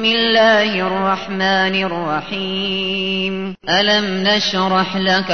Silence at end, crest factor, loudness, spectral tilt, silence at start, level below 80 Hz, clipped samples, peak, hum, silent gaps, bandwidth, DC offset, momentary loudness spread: 0 s; 14 dB; -16 LUFS; -4.5 dB/octave; 0 s; -52 dBFS; under 0.1%; -2 dBFS; none; none; 6.6 kHz; 0.8%; 9 LU